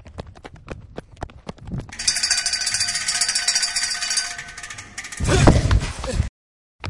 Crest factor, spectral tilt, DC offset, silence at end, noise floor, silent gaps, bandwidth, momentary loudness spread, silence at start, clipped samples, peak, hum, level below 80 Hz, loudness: 22 dB; -3 dB/octave; under 0.1%; 0 s; -41 dBFS; 6.29-6.79 s; 11.5 kHz; 22 LU; 0.05 s; under 0.1%; 0 dBFS; none; -30 dBFS; -20 LUFS